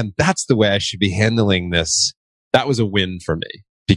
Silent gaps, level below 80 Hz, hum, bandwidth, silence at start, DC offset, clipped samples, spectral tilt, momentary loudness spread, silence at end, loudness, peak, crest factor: 2.17-2.51 s, 3.69-3.86 s; -46 dBFS; none; 11.5 kHz; 0 s; under 0.1%; under 0.1%; -4 dB/octave; 9 LU; 0 s; -18 LUFS; 0 dBFS; 18 dB